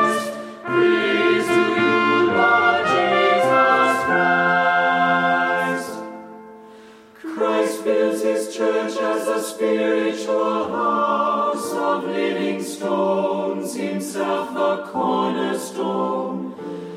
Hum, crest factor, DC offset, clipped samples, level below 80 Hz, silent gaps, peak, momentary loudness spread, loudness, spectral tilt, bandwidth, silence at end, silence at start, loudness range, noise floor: none; 16 dB; under 0.1%; under 0.1%; -68 dBFS; none; -4 dBFS; 9 LU; -19 LUFS; -4.5 dB/octave; 15.5 kHz; 0 s; 0 s; 7 LU; -44 dBFS